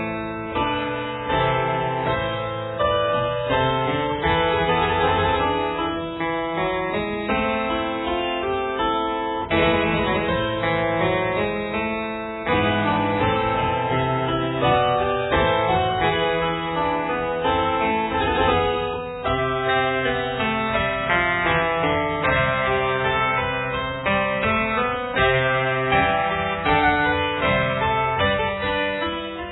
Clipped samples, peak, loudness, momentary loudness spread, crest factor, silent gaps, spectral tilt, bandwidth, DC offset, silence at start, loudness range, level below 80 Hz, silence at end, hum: under 0.1%; -6 dBFS; -21 LUFS; 5 LU; 16 dB; none; -9 dB/octave; 4.1 kHz; under 0.1%; 0 s; 3 LU; -40 dBFS; 0 s; none